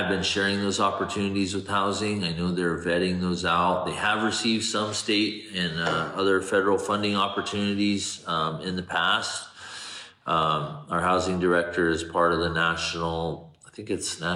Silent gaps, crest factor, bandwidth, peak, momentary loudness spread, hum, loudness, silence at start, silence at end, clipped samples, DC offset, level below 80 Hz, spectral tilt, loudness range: none; 16 dB; 12.5 kHz; -10 dBFS; 8 LU; none; -25 LUFS; 0 s; 0 s; under 0.1%; under 0.1%; -54 dBFS; -4 dB/octave; 2 LU